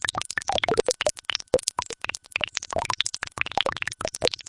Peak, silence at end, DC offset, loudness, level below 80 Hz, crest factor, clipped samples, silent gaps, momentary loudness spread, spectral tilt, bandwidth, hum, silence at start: -2 dBFS; 0.05 s; under 0.1%; -27 LUFS; -52 dBFS; 26 dB; under 0.1%; none; 6 LU; -1.5 dB/octave; 11.5 kHz; none; 0.05 s